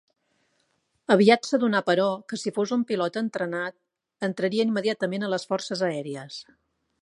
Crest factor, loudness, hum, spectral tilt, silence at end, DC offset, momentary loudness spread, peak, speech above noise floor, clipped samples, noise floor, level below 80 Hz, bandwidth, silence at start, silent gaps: 22 dB; -25 LUFS; none; -5 dB/octave; 0.6 s; under 0.1%; 15 LU; -4 dBFS; 47 dB; under 0.1%; -72 dBFS; -78 dBFS; 11.5 kHz; 1.1 s; none